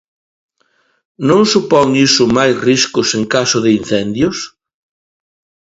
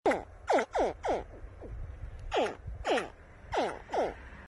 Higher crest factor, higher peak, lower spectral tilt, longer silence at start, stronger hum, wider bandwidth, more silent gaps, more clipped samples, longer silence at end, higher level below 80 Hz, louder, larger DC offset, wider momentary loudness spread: second, 14 dB vs 20 dB; first, 0 dBFS vs -14 dBFS; about the same, -4 dB/octave vs -5 dB/octave; first, 1.2 s vs 0.05 s; neither; second, 8 kHz vs 11.5 kHz; neither; neither; first, 1.2 s vs 0 s; about the same, -48 dBFS vs -48 dBFS; first, -12 LUFS vs -33 LUFS; neither; second, 7 LU vs 16 LU